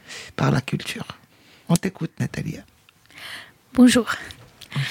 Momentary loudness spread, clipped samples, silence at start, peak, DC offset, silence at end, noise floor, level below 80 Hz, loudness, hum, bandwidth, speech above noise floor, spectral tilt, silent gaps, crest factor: 23 LU; under 0.1%; 0.1 s; -2 dBFS; under 0.1%; 0 s; -53 dBFS; -54 dBFS; -22 LUFS; none; 16.5 kHz; 32 dB; -5.5 dB/octave; none; 22 dB